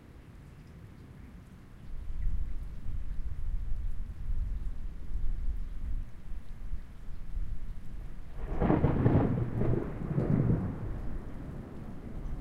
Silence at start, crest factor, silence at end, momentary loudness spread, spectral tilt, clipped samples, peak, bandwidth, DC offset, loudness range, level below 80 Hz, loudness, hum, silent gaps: 0 s; 22 dB; 0 s; 22 LU; -10 dB/octave; under 0.1%; -10 dBFS; 4.1 kHz; under 0.1%; 13 LU; -36 dBFS; -35 LUFS; none; none